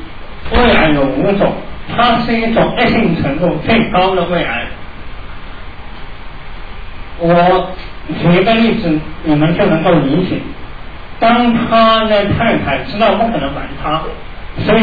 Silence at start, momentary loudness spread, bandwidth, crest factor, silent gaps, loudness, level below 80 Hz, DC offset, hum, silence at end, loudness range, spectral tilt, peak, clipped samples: 0 s; 22 LU; 5 kHz; 12 dB; none; -13 LUFS; -28 dBFS; 4%; none; 0 s; 6 LU; -9 dB/octave; 0 dBFS; under 0.1%